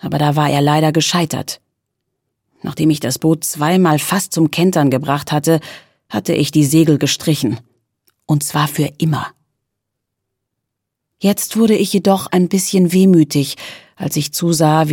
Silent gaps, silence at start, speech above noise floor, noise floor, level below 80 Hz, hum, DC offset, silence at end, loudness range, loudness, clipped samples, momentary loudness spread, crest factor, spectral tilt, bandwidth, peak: none; 0.05 s; 63 dB; -77 dBFS; -56 dBFS; none; under 0.1%; 0 s; 6 LU; -15 LUFS; under 0.1%; 11 LU; 14 dB; -5.5 dB/octave; 17.5 kHz; 0 dBFS